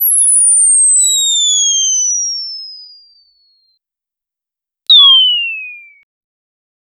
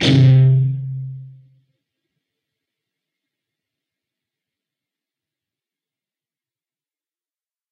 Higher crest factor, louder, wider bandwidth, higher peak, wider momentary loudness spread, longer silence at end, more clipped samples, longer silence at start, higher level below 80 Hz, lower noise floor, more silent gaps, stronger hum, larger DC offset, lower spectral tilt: about the same, 14 dB vs 18 dB; first, -7 LUFS vs -14 LUFS; first, 19.5 kHz vs 7 kHz; about the same, 0 dBFS vs -2 dBFS; about the same, 20 LU vs 21 LU; second, 1.2 s vs 6.4 s; neither; about the same, 0 s vs 0 s; second, -74 dBFS vs -54 dBFS; second, -86 dBFS vs under -90 dBFS; neither; neither; neither; second, 11 dB/octave vs -7 dB/octave